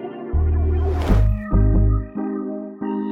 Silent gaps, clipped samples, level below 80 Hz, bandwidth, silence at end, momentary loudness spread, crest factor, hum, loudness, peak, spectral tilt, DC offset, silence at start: none; under 0.1%; -22 dBFS; 5.6 kHz; 0 s; 9 LU; 14 dB; none; -21 LUFS; -4 dBFS; -9.5 dB/octave; under 0.1%; 0 s